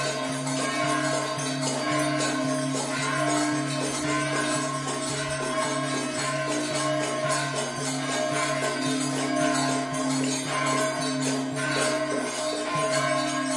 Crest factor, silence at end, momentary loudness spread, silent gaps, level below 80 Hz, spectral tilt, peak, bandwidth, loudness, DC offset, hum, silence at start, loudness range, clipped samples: 14 dB; 0 s; 4 LU; none; -62 dBFS; -3.5 dB/octave; -12 dBFS; 11.5 kHz; -26 LUFS; under 0.1%; none; 0 s; 1 LU; under 0.1%